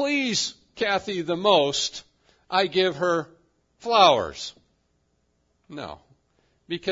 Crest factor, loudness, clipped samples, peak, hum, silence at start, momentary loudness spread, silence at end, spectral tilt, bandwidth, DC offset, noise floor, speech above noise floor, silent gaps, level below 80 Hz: 22 dB; -23 LUFS; under 0.1%; -2 dBFS; none; 0 s; 20 LU; 0 s; -3 dB/octave; 7.8 kHz; under 0.1%; -70 dBFS; 47 dB; none; -62 dBFS